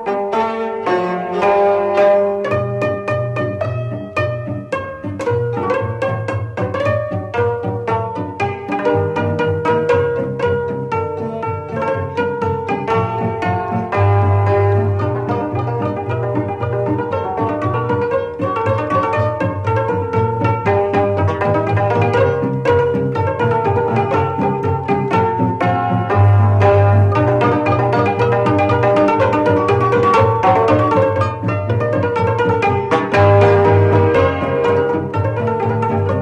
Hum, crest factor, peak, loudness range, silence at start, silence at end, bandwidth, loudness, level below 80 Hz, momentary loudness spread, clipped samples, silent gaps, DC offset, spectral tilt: none; 14 dB; -2 dBFS; 6 LU; 0 s; 0 s; 8.4 kHz; -16 LUFS; -36 dBFS; 8 LU; under 0.1%; none; under 0.1%; -8.5 dB/octave